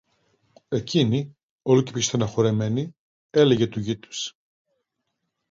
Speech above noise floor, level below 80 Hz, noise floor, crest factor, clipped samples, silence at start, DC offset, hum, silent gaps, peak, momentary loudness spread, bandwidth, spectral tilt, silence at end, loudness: 57 dB; -58 dBFS; -79 dBFS; 20 dB; under 0.1%; 0.7 s; under 0.1%; none; 1.43-1.59 s, 2.99-3.29 s; -6 dBFS; 13 LU; 7.8 kHz; -5.5 dB/octave; 1.2 s; -23 LUFS